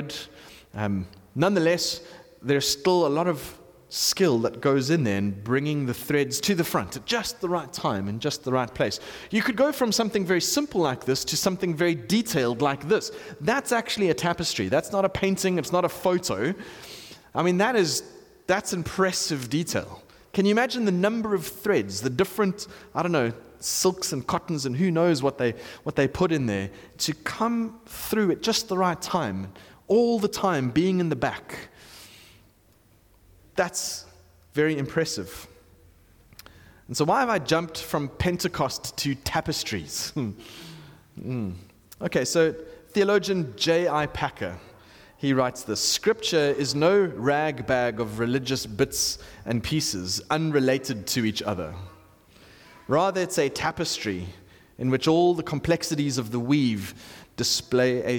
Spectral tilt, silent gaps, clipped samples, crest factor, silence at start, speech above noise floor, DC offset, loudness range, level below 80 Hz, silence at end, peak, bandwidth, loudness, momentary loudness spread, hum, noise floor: -4.5 dB/octave; none; under 0.1%; 14 dB; 0 s; 34 dB; under 0.1%; 5 LU; -54 dBFS; 0 s; -10 dBFS; 19 kHz; -25 LUFS; 12 LU; none; -59 dBFS